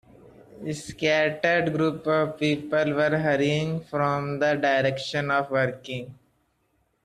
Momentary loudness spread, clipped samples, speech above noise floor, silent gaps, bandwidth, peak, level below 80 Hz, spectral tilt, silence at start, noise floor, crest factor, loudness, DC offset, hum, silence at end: 12 LU; under 0.1%; 46 dB; none; 13 kHz; -8 dBFS; -62 dBFS; -6 dB/octave; 0.5 s; -70 dBFS; 18 dB; -24 LUFS; under 0.1%; none; 0.9 s